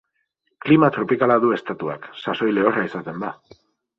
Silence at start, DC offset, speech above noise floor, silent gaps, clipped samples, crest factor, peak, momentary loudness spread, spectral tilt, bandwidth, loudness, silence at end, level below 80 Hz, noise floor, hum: 0.65 s; under 0.1%; 52 dB; none; under 0.1%; 18 dB; -2 dBFS; 14 LU; -8.5 dB/octave; 6 kHz; -20 LUFS; 0.65 s; -64 dBFS; -72 dBFS; none